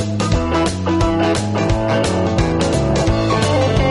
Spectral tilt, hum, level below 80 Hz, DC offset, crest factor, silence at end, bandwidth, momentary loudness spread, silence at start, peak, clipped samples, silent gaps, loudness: -6 dB/octave; none; -26 dBFS; under 0.1%; 12 dB; 0 s; 11.5 kHz; 2 LU; 0 s; -2 dBFS; under 0.1%; none; -17 LUFS